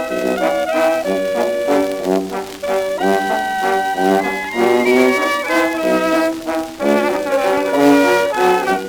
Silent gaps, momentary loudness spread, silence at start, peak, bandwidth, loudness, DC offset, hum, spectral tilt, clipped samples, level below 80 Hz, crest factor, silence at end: none; 7 LU; 0 s; -2 dBFS; over 20 kHz; -16 LUFS; under 0.1%; none; -4.5 dB/octave; under 0.1%; -50 dBFS; 14 dB; 0 s